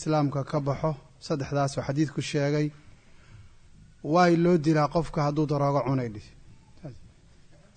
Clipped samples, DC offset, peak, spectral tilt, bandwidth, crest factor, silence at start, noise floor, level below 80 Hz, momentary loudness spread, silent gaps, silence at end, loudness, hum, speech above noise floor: under 0.1%; under 0.1%; -10 dBFS; -7 dB/octave; 9.4 kHz; 18 dB; 0 s; -54 dBFS; -52 dBFS; 17 LU; none; 0.7 s; -26 LUFS; none; 28 dB